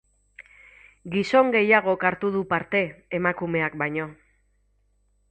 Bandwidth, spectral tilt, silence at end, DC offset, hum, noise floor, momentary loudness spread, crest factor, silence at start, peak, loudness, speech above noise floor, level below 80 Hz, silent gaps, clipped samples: 8.4 kHz; -6.5 dB/octave; 1.2 s; under 0.1%; 50 Hz at -50 dBFS; -66 dBFS; 11 LU; 20 dB; 0.4 s; -4 dBFS; -23 LUFS; 43 dB; -60 dBFS; none; under 0.1%